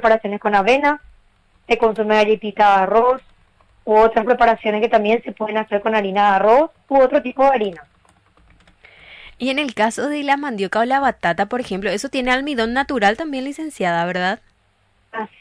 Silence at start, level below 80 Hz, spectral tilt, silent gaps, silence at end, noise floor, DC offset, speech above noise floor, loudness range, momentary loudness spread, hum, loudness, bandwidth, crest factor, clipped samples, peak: 0 s; -48 dBFS; -5 dB/octave; none; 0.15 s; -60 dBFS; under 0.1%; 43 dB; 5 LU; 9 LU; none; -17 LUFS; 11 kHz; 14 dB; under 0.1%; -4 dBFS